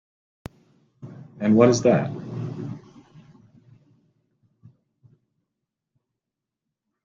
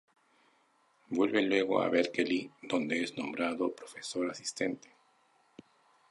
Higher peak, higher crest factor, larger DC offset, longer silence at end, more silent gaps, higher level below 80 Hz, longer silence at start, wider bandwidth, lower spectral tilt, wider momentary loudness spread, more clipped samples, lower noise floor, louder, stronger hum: first, -4 dBFS vs -14 dBFS; about the same, 24 dB vs 20 dB; neither; first, 4.25 s vs 1.35 s; neither; first, -62 dBFS vs -76 dBFS; about the same, 1 s vs 1.1 s; second, 7.6 kHz vs 11.5 kHz; first, -6.5 dB/octave vs -4 dB/octave; first, 28 LU vs 8 LU; neither; first, -86 dBFS vs -70 dBFS; first, -21 LUFS vs -32 LUFS; neither